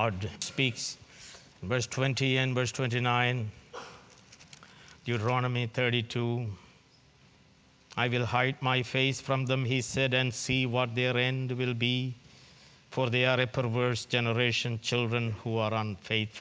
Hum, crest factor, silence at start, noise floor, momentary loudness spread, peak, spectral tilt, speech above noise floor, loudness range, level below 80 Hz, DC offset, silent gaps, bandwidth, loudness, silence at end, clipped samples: none; 20 dB; 0 s; -61 dBFS; 13 LU; -10 dBFS; -5 dB/octave; 32 dB; 4 LU; -60 dBFS; under 0.1%; none; 8 kHz; -29 LUFS; 0 s; under 0.1%